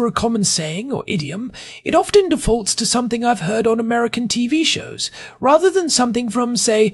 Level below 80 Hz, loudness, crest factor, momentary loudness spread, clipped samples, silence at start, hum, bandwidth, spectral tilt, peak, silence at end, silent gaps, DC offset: -40 dBFS; -17 LUFS; 16 dB; 10 LU; under 0.1%; 0 s; none; 13.5 kHz; -3.5 dB/octave; -2 dBFS; 0 s; none; under 0.1%